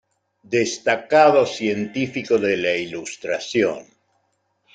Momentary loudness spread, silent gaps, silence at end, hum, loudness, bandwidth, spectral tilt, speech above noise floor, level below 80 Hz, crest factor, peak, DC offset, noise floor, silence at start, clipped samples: 12 LU; none; 0.95 s; none; -20 LUFS; 9.4 kHz; -4 dB/octave; 49 dB; -66 dBFS; 20 dB; -2 dBFS; under 0.1%; -69 dBFS; 0.5 s; under 0.1%